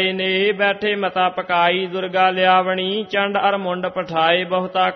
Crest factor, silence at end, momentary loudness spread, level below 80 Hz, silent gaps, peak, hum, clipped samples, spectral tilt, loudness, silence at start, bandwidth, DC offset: 18 dB; 0 s; 6 LU; -64 dBFS; none; -2 dBFS; none; under 0.1%; -6.5 dB/octave; -18 LUFS; 0 s; 6.2 kHz; under 0.1%